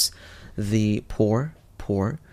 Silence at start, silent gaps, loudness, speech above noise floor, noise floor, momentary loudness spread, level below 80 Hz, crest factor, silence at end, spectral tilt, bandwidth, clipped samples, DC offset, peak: 0 s; none; -25 LUFS; 19 dB; -43 dBFS; 15 LU; -44 dBFS; 18 dB; 0.15 s; -5.5 dB/octave; 16 kHz; under 0.1%; under 0.1%; -8 dBFS